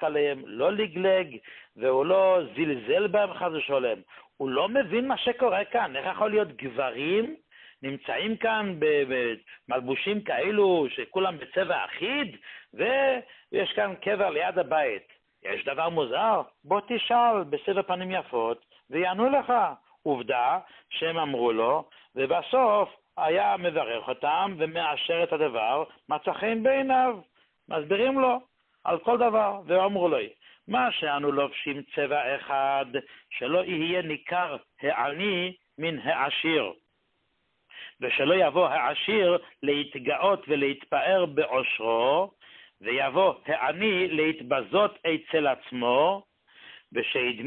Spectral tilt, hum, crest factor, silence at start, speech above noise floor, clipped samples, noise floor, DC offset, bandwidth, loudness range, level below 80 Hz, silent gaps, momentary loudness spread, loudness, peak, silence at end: -9 dB/octave; none; 16 dB; 0 s; 48 dB; under 0.1%; -74 dBFS; under 0.1%; 4.3 kHz; 3 LU; -70 dBFS; none; 9 LU; -26 LUFS; -10 dBFS; 0 s